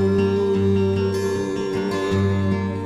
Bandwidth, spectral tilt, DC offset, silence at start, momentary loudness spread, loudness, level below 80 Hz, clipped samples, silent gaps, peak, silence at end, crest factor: 12.5 kHz; -7.5 dB/octave; under 0.1%; 0 s; 5 LU; -21 LUFS; -52 dBFS; under 0.1%; none; -8 dBFS; 0 s; 12 dB